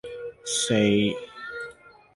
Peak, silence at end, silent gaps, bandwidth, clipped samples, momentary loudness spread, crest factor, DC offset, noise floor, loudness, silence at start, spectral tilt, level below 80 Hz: -8 dBFS; 0.45 s; none; 11.5 kHz; under 0.1%; 17 LU; 18 dB; under 0.1%; -47 dBFS; -24 LUFS; 0.05 s; -4 dB/octave; -58 dBFS